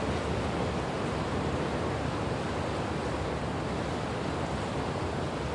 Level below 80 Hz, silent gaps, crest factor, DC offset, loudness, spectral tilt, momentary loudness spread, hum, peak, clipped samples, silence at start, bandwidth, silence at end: -44 dBFS; none; 12 dB; under 0.1%; -32 LUFS; -6 dB/octave; 2 LU; none; -18 dBFS; under 0.1%; 0 s; 11.5 kHz; 0 s